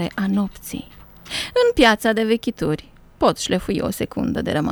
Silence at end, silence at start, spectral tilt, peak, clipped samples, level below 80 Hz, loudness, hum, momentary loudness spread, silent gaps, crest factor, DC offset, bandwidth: 0 s; 0 s; -5 dB/octave; -2 dBFS; under 0.1%; -42 dBFS; -20 LUFS; none; 14 LU; none; 20 dB; under 0.1%; 19.5 kHz